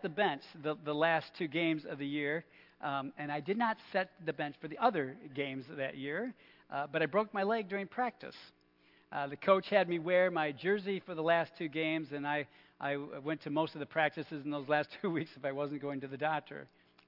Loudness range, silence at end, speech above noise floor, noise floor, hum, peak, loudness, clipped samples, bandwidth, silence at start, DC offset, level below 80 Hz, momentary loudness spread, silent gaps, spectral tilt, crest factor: 4 LU; 0.4 s; 32 dB; -68 dBFS; none; -14 dBFS; -35 LUFS; under 0.1%; 5.8 kHz; 0 s; under 0.1%; -84 dBFS; 10 LU; none; -8 dB/octave; 22 dB